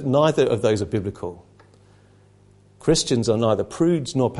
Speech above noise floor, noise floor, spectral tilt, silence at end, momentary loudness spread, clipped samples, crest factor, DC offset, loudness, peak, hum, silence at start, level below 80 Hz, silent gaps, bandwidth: 33 dB; -53 dBFS; -5.5 dB/octave; 0 s; 9 LU; under 0.1%; 18 dB; under 0.1%; -21 LUFS; -4 dBFS; 50 Hz at -50 dBFS; 0 s; -48 dBFS; none; 11.5 kHz